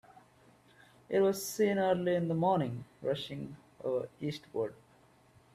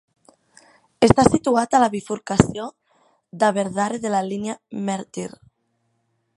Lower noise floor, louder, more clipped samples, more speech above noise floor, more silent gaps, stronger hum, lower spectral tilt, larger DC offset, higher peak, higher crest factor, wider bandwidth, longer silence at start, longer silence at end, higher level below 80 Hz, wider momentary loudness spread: second, -64 dBFS vs -70 dBFS; second, -33 LUFS vs -20 LUFS; neither; second, 32 dB vs 50 dB; neither; neither; about the same, -6 dB/octave vs -5.5 dB/octave; neither; second, -18 dBFS vs 0 dBFS; second, 16 dB vs 22 dB; first, 15.5 kHz vs 11.5 kHz; second, 0.15 s vs 1 s; second, 0.8 s vs 1.1 s; second, -72 dBFS vs -46 dBFS; second, 11 LU vs 16 LU